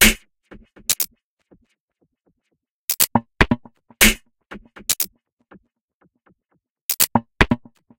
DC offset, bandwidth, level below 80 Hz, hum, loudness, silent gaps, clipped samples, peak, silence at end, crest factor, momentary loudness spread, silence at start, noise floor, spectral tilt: under 0.1%; 18 kHz; -34 dBFS; none; -19 LUFS; 1.24-1.37 s, 1.80-1.88 s, 2.70-2.88 s, 5.32-5.37 s, 5.81-5.88 s, 5.94-6.01 s, 6.70-6.89 s; under 0.1%; 0 dBFS; 0.4 s; 24 dB; 16 LU; 0 s; -76 dBFS; -2 dB/octave